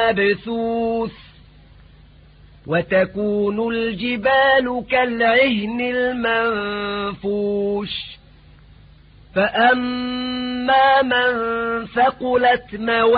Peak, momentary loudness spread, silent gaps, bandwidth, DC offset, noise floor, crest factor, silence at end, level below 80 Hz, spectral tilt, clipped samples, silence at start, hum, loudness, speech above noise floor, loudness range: -4 dBFS; 9 LU; none; 5 kHz; under 0.1%; -47 dBFS; 16 dB; 0 s; -48 dBFS; -10 dB/octave; under 0.1%; 0 s; none; -19 LUFS; 28 dB; 5 LU